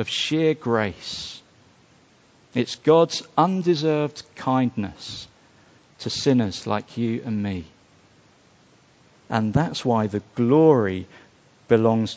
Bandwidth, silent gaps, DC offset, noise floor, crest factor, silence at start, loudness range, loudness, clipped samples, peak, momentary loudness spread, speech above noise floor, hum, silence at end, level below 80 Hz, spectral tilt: 8 kHz; none; under 0.1%; -56 dBFS; 20 dB; 0 s; 5 LU; -22 LUFS; under 0.1%; -4 dBFS; 15 LU; 34 dB; none; 0 s; -52 dBFS; -6 dB/octave